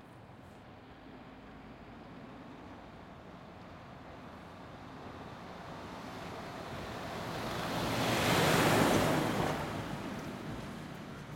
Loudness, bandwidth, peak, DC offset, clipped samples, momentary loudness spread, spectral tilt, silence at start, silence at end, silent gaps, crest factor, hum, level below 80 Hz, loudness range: -34 LUFS; 16.5 kHz; -14 dBFS; under 0.1%; under 0.1%; 24 LU; -4.5 dB/octave; 0 s; 0 s; none; 24 dB; none; -58 dBFS; 20 LU